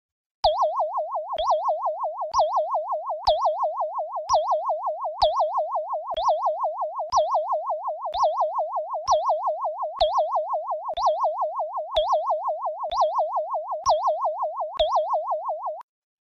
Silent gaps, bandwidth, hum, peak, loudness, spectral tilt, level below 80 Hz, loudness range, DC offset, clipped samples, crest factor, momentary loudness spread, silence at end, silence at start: none; 6.8 kHz; none; -8 dBFS; -25 LUFS; -1.5 dB/octave; -52 dBFS; 1 LU; under 0.1%; under 0.1%; 16 dB; 7 LU; 0.4 s; 0.45 s